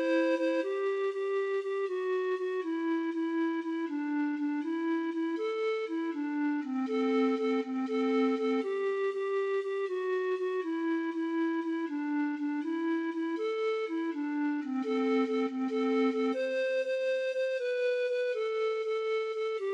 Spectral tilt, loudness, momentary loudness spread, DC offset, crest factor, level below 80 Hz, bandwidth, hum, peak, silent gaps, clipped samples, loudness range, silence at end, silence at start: -4.5 dB/octave; -32 LUFS; 5 LU; under 0.1%; 12 dB; under -90 dBFS; 9 kHz; none; -18 dBFS; none; under 0.1%; 2 LU; 0 s; 0 s